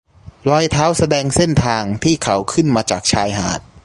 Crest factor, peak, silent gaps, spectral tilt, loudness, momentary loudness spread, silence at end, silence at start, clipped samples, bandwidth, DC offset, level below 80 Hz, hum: 16 dB; 0 dBFS; none; -4.5 dB/octave; -16 LUFS; 4 LU; 0.05 s; 0.25 s; under 0.1%; 11.5 kHz; under 0.1%; -36 dBFS; none